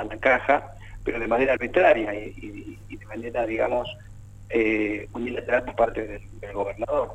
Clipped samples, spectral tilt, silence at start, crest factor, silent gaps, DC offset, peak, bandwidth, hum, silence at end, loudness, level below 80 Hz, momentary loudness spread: under 0.1%; -6.5 dB/octave; 0 s; 20 dB; none; under 0.1%; -6 dBFS; 9.2 kHz; 50 Hz at -45 dBFS; 0 s; -24 LUFS; -44 dBFS; 19 LU